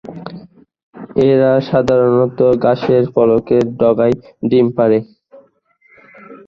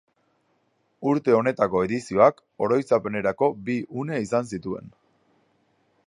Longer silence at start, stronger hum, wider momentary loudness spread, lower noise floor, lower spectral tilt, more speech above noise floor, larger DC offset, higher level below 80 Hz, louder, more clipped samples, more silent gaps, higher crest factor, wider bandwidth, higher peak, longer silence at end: second, 0.05 s vs 1 s; neither; second, 7 LU vs 11 LU; second, -55 dBFS vs -69 dBFS; first, -8.5 dB/octave vs -7 dB/octave; second, 42 dB vs 46 dB; neither; first, -48 dBFS vs -60 dBFS; first, -13 LUFS vs -24 LUFS; neither; first, 0.83-0.93 s vs none; second, 14 dB vs 22 dB; second, 7.2 kHz vs 11 kHz; first, 0 dBFS vs -4 dBFS; second, 0.1 s vs 1.2 s